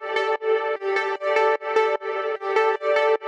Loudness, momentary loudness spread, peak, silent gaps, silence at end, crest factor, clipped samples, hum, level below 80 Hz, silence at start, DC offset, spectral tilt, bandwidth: -22 LUFS; 4 LU; -6 dBFS; none; 0 s; 16 dB; under 0.1%; none; -82 dBFS; 0 s; under 0.1%; -1.5 dB/octave; 8.8 kHz